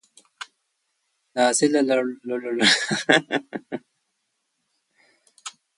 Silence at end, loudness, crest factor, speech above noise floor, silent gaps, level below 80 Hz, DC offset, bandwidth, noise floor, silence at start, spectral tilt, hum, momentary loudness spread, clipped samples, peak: 0.3 s; -21 LUFS; 24 dB; 54 dB; none; -72 dBFS; under 0.1%; 11.5 kHz; -75 dBFS; 0.4 s; -2.5 dB/octave; none; 22 LU; under 0.1%; -2 dBFS